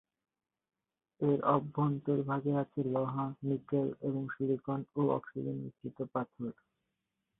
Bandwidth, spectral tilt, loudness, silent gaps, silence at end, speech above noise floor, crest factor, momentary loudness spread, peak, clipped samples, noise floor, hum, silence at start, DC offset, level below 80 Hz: 3.9 kHz; -12 dB/octave; -35 LUFS; none; 0.85 s; 52 dB; 22 dB; 10 LU; -14 dBFS; under 0.1%; -86 dBFS; none; 1.2 s; under 0.1%; -74 dBFS